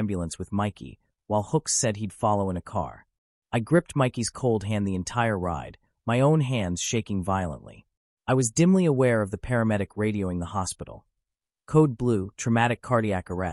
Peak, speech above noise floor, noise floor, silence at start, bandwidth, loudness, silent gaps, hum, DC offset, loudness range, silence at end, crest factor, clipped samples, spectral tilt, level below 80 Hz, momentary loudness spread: -8 dBFS; 60 dB; -85 dBFS; 0 s; 12 kHz; -26 LUFS; 3.18-3.42 s, 7.97-8.17 s; none; under 0.1%; 2 LU; 0 s; 18 dB; under 0.1%; -5.5 dB/octave; -50 dBFS; 11 LU